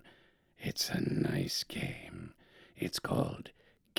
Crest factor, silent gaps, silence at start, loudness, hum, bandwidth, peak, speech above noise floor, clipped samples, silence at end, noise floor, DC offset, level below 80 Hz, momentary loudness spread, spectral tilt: 24 dB; none; 0.05 s; -36 LUFS; none; over 20 kHz; -14 dBFS; 30 dB; under 0.1%; 0.5 s; -65 dBFS; under 0.1%; -60 dBFS; 16 LU; -4.5 dB/octave